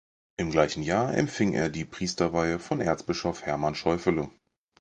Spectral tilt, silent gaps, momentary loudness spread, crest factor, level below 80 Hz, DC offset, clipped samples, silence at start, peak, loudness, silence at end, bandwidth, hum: -5.5 dB/octave; none; 7 LU; 20 dB; -50 dBFS; under 0.1%; under 0.1%; 0.4 s; -8 dBFS; -28 LUFS; 0.5 s; 10 kHz; none